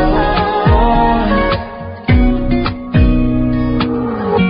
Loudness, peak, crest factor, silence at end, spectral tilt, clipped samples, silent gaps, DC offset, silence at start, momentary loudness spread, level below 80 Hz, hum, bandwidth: -14 LUFS; -2 dBFS; 10 dB; 0 s; -6 dB/octave; under 0.1%; none; under 0.1%; 0 s; 5 LU; -18 dBFS; none; 5.4 kHz